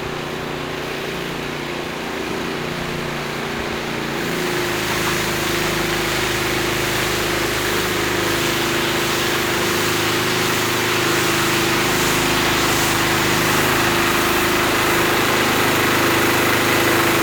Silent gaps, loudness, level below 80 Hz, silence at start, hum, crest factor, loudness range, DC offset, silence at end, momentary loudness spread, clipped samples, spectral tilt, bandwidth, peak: none; -18 LUFS; -40 dBFS; 0 s; none; 16 dB; 8 LU; under 0.1%; 0 s; 9 LU; under 0.1%; -3 dB/octave; over 20 kHz; -4 dBFS